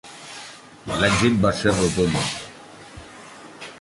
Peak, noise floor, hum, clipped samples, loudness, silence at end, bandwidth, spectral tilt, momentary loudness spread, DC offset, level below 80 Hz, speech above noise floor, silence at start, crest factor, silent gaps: -4 dBFS; -43 dBFS; none; under 0.1%; -21 LUFS; 0 s; 11.5 kHz; -4.5 dB/octave; 23 LU; under 0.1%; -44 dBFS; 23 dB; 0.05 s; 20 dB; none